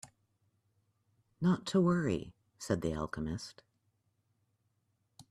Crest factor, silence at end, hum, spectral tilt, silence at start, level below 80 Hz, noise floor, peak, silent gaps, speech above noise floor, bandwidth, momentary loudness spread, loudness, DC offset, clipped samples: 20 dB; 0.1 s; none; -6.5 dB/octave; 0.05 s; -60 dBFS; -79 dBFS; -18 dBFS; none; 46 dB; 12 kHz; 17 LU; -34 LUFS; under 0.1%; under 0.1%